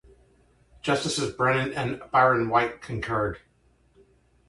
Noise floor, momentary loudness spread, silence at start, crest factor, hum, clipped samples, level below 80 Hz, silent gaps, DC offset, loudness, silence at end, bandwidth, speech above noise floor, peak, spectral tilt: -63 dBFS; 11 LU; 0.85 s; 20 dB; none; under 0.1%; -52 dBFS; none; under 0.1%; -25 LUFS; 1.1 s; 11.5 kHz; 38 dB; -6 dBFS; -5 dB/octave